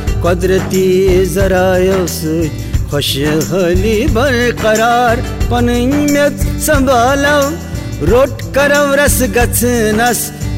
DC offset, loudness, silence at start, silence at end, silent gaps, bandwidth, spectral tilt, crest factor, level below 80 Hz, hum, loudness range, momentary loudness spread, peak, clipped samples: 0.4%; -12 LUFS; 0 s; 0 s; none; 16.5 kHz; -5 dB/octave; 10 dB; -22 dBFS; none; 1 LU; 6 LU; -2 dBFS; under 0.1%